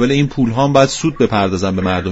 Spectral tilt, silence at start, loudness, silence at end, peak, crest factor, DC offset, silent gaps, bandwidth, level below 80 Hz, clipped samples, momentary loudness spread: -6 dB/octave; 0 s; -15 LUFS; 0 s; 0 dBFS; 14 dB; under 0.1%; none; 8 kHz; -38 dBFS; under 0.1%; 5 LU